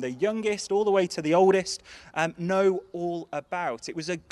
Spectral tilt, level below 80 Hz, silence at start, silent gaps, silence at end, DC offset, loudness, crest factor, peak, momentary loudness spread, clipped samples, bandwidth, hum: -5 dB/octave; -66 dBFS; 0 s; none; 0.1 s; under 0.1%; -26 LUFS; 18 dB; -8 dBFS; 12 LU; under 0.1%; 12 kHz; none